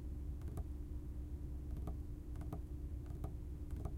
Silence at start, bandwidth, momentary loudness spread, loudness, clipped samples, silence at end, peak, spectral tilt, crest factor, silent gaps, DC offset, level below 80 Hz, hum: 0 s; 15.5 kHz; 2 LU; -48 LUFS; under 0.1%; 0 s; -30 dBFS; -8.5 dB/octave; 14 dB; none; under 0.1%; -46 dBFS; none